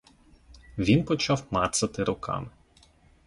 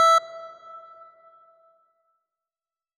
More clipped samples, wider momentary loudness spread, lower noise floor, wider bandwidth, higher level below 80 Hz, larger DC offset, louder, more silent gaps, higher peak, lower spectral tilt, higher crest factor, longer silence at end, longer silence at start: neither; second, 11 LU vs 28 LU; second, -59 dBFS vs under -90 dBFS; second, 11.5 kHz vs 15.5 kHz; first, -50 dBFS vs under -90 dBFS; neither; second, -27 LUFS vs -20 LUFS; neither; about the same, -10 dBFS vs -12 dBFS; first, -5 dB/octave vs 2.5 dB/octave; about the same, 20 dB vs 16 dB; second, 0.8 s vs 2.2 s; first, 0.75 s vs 0 s